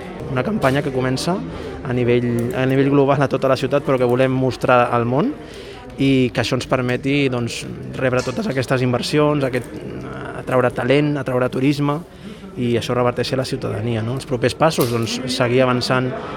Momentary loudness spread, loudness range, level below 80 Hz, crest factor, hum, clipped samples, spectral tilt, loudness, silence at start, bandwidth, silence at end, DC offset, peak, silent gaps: 12 LU; 4 LU; -44 dBFS; 18 dB; none; under 0.1%; -6 dB/octave; -19 LUFS; 0 s; 18.5 kHz; 0 s; under 0.1%; 0 dBFS; none